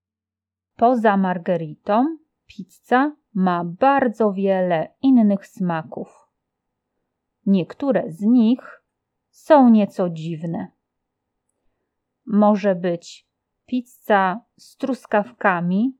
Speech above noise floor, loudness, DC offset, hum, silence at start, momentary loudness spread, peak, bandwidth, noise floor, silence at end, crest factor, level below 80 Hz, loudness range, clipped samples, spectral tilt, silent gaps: 70 dB; -20 LUFS; under 0.1%; none; 0.8 s; 13 LU; -2 dBFS; 12.5 kHz; -89 dBFS; 0.05 s; 18 dB; -74 dBFS; 5 LU; under 0.1%; -8 dB/octave; none